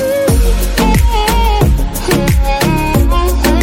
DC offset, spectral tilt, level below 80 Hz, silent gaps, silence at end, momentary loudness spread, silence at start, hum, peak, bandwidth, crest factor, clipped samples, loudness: under 0.1%; -5.5 dB/octave; -14 dBFS; none; 0 s; 2 LU; 0 s; none; 0 dBFS; 17 kHz; 10 dB; under 0.1%; -12 LUFS